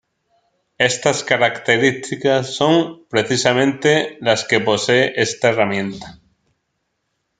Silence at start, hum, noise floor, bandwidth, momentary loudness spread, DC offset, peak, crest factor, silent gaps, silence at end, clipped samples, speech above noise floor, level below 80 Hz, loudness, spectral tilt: 0.8 s; none; -72 dBFS; 9.6 kHz; 5 LU; under 0.1%; 0 dBFS; 18 dB; none; 1.25 s; under 0.1%; 55 dB; -58 dBFS; -17 LUFS; -4 dB/octave